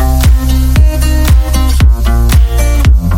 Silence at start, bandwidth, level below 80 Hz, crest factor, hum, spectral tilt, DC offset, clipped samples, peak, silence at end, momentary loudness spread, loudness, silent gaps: 0 s; 16.5 kHz; -8 dBFS; 6 dB; none; -5.5 dB/octave; 0.1%; 3%; 0 dBFS; 0 s; 2 LU; -10 LUFS; none